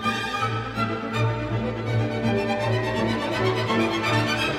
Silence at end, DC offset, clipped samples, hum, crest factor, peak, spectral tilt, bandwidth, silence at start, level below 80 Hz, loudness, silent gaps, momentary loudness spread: 0 s; under 0.1%; under 0.1%; none; 14 dB; -10 dBFS; -6 dB/octave; 14.5 kHz; 0 s; -46 dBFS; -24 LUFS; none; 5 LU